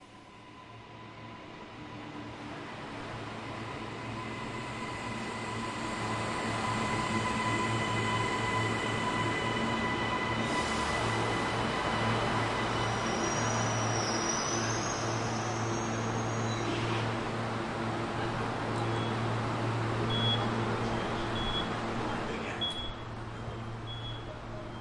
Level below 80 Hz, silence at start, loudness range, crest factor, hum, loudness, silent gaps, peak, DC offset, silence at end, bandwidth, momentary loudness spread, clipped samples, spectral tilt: -52 dBFS; 0 s; 9 LU; 16 dB; none; -32 LUFS; none; -18 dBFS; under 0.1%; 0 s; 11.5 kHz; 12 LU; under 0.1%; -4.5 dB/octave